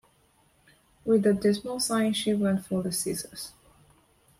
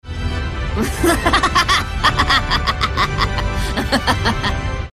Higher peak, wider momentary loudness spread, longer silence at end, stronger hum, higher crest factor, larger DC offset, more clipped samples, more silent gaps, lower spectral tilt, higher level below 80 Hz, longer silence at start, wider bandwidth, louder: second, -12 dBFS vs 0 dBFS; first, 14 LU vs 9 LU; first, 0.9 s vs 0.05 s; neither; about the same, 18 dB vs 16 dB; second, under 0.1% vs 0.2%; neither; neither; about the same, -4.5 dB/octave vs -4 dB/octave; second, -62 dBFS vs -24 dBFS; first, 1.05 s vs 0.05 s; first, 16 kHz vs 14.5 kHz; second, -27 LUFS vs -17 LUFS